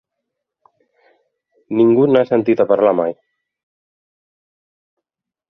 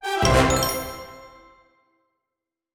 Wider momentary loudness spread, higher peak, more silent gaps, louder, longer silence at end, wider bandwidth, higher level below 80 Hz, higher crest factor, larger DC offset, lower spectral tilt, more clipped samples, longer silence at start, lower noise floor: second, 9 LU vs 21 LU; about the same, -2 dBFS vs -4 dBFS; neither; first, -15 LUFS vs -20 LUFS; first, 2.35 s vs 1.45 s; second, 5.4 kHz vs over 20 kHz; second, -64 dBFS vs -36 dBFS; about the same, 18 dB vs 20 dB; neither; first, -9.5 dB/octave vs -4 dB/octave; neither; first, 1.7 s vs 0 s; about the same, -83 dBFS vs -86 dBFS